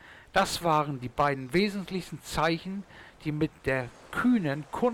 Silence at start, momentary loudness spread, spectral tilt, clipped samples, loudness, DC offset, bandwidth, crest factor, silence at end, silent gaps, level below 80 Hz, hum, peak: 0.05 s; 10 LU; -5.5 dB/octave; under 0.1%; -29 LUFS; under 0.1%; 18 kHz; 14 dB; 0 s; none; -52 dBFS; none; -14 dBFS